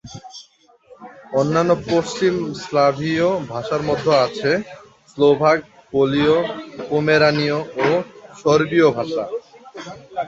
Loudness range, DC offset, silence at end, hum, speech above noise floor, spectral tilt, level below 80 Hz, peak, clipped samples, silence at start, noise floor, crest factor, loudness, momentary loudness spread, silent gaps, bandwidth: 2 LU; under 0.1%; 0 s; none; 35 dB; -6 dB/octave; -54 dBFS; -2 dBFS; under 0.1%; 0.05 s; -52 dBFS; 16 dB; -18 LUFS; 17 LU; none; 8 kHz